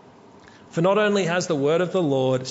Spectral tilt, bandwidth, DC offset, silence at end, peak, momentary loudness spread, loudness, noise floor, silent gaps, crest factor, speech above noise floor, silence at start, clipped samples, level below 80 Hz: -5.5 dB/octave; 8 kHz; under 0.1%; 0 s; -8 dBFS; 4 LU; -22 LUFS; -48 dBFS; none; 14 dB; 28 dB; 0.75 s; under 0.1%; -68 dBFS